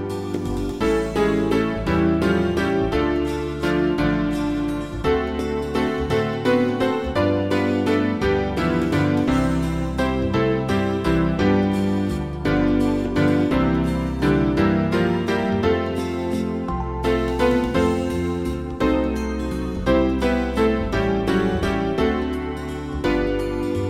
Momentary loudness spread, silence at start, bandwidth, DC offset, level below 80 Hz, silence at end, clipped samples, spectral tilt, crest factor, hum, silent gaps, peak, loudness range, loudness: 6 LU; 0 s; 15.5 kHz; 0.3%; -32 dBFS; 0 s; under 0.1%; -7 dB/octave; 16 dB; none; none; -4 dBFS; 2 LU; -21 LUFS